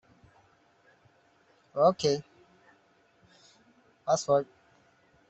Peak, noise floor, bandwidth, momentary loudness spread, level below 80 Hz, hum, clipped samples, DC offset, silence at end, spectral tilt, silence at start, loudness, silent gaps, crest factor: -12 dBFS; -65 dBFS; 8.2 kHz; 15 LU; -72 dBFS; none; under 0.1%; under 0.1%; 0.85 s; -4.5 dB/octave; 1.75 s; -28 LUFS; none; 22 dB